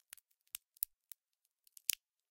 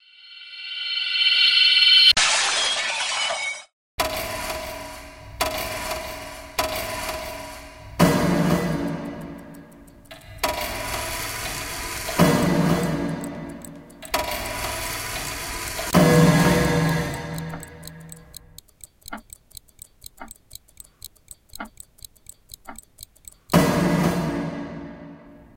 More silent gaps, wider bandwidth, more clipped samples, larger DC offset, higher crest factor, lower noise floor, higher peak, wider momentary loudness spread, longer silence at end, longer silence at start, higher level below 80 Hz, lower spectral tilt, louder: second, none vs 3.73-3.98 s; about the same, 17 kHz vs 17 kHz; neither; neither; first, 38 dB vs 22 dB; first, -87 dBFS vs -47 dBFS; second, -10 dBFS vs -2 dBFS; second, 19 LU vs 26 LU; first, 0.35 s vs 0.15 s; first, 1.9 s vs 0.25 s; second, -86 dBFS vs -44 dBFS; second, 4 dB/octave vs -3.5 dB/octave; second, -42 LUFS vs -21 LUFS